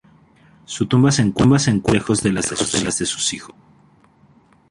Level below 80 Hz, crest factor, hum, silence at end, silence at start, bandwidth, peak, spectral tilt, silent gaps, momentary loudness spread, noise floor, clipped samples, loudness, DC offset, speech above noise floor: -44 dBFS; 18 dB; none; 1.2 s; 0.7 s; 11.5 kHz; -2 dBFS; -4.5 dB/octave; none; 8 LU; -53 dBFS; under 0.1%; -18 LUFS; under 0.1%; 35 dB